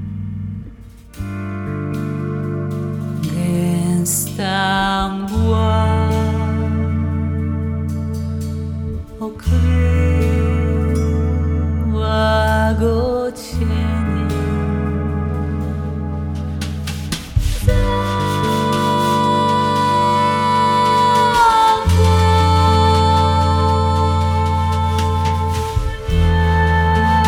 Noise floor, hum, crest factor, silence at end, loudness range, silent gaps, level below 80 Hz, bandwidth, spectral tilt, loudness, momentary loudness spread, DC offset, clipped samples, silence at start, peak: -37 dBFS; none; 16 dB; 0 s; 8 LU; none; -28 dBFS; 16.5 kHz; -6 dB/octave; -17 LUFS; 11 LU; under 0.1%; under 0.1%; 0 s; -2 dBFS